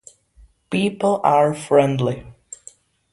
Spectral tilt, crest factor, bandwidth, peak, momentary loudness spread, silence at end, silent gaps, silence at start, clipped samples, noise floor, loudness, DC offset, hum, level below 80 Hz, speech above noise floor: -6 dB/octave; 18 dB; 11.5 kHz; -2 dBFS; 22 LU; 0.8 s; none; 0.7 s; under 0.1%; -52 dBFS; -19 LUFS; under 0.1%; none; -54 dBFS; 34 dB